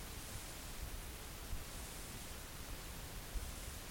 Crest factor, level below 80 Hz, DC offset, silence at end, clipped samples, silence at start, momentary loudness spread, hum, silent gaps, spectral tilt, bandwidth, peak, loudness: 16 dB; -50 dBFS; under 0.1%; 0 s; under 0.1%; 0 s; 2 LU; none; none; -3 dB/octave; 17 kHz; -32 dBFS; -48 LUFS